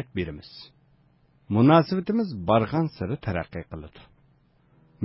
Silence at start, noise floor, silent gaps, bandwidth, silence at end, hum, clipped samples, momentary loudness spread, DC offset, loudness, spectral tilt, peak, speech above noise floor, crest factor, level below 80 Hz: 0 s; -62 dBFS; none; 5.8 kHz; 0 s; none; under 0.1%; 23 LU; under 0.1%; -24 LUFS; -11.5 dB/octave; -6 dBFS; 37 dB; 20 dB; -48 dBFS